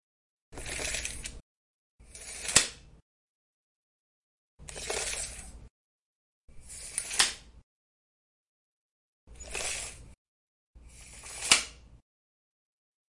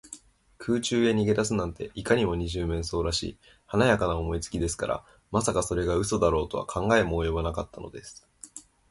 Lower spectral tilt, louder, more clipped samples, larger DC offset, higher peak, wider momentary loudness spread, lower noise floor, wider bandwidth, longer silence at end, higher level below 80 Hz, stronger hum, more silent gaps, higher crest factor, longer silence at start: second, 0 dB/octave vs -5 dB/octave; about the same, -29 LUFS vs -27 LUFS; neither; neither; first, -4 dBFS vs -8 dBFS; first, 25 LU vs 19 LU; first, under -90 dBFS vs -50 dBFS; about the same, 11.5 kHz vs 12 kHz; first, 1.15 s vs 0.3 s; second, -54 dBFS vs -42 dBFS; neither; first, 1.40-1.99 s, 3.02-4.58 s, 5.70-6.48 s, 7.63-9.27 s, 10.18-10.74 s vs none; first, 34 dB vs 20 dB; first, 0.5 s vs 0.05 s